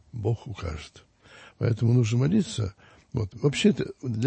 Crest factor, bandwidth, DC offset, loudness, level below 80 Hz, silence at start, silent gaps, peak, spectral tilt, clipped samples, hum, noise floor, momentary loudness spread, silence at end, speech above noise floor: 18 dB; 8.8 kHz; under 0.1%; -26 LUFS; -50 dBFS; 0.15 s; none; -8 dBFS; -6.5 dB/octave; under 0.1%; none; -52 dBFS; 13 LU; 0 s; 27 dB